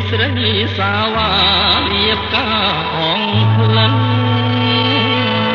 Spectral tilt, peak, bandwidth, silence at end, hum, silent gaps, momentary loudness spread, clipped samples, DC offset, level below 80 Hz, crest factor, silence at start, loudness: -7.5 dB/octave; -2 dBFS; 6 kHz; 0 s; none; none; 4 LU; under 0.1%; under 0.1%; -36 dBFS; 12 dB; 0 s; -13 LUFS